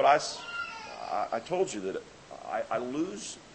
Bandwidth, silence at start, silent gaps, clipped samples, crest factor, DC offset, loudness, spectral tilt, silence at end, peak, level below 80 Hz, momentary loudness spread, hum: 8.8 kHz; 0 s; none; under 0.1%; 22 dB; under 0.1%; -33 LUFS; -3.5 dB/octave; 0 s; -10 dBFS; -68 dBFS; 11 LU; none